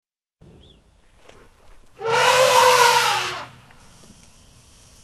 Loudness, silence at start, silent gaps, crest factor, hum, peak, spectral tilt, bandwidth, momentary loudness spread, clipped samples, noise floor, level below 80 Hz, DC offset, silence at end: -16 LUFS; 2 s; none; 20 dB; none; -2 dBFS; -0.5 dB/octave; 13.5 kHz; 18 LU; under 0.1%; -54 dBFS; -56 dBFS; under 0.1%; 1.55 s